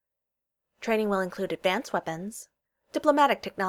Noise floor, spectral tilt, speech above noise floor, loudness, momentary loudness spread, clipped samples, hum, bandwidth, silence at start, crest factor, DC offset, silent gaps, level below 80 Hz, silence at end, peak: -86 dBFS; -4.5 dB/octave; 59 dB; -27 LUFS; 15 LU; under 0.1%; none; 17.5 kHz; 0.8 s; 20 dB; under 0.1%; none; -68 dBFS; 0 s; -8 dBFS